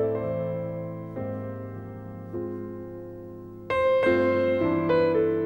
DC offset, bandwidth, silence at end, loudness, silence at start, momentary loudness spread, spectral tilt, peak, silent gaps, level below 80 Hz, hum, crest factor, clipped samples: 0.1%; 5.8 kHz; 0 s; -26 LUFS; 0 s; 17 LU; -8.5 dB/octave; -10 dBFS; none; -56 dBFS; none; 16 dB; under 0.1%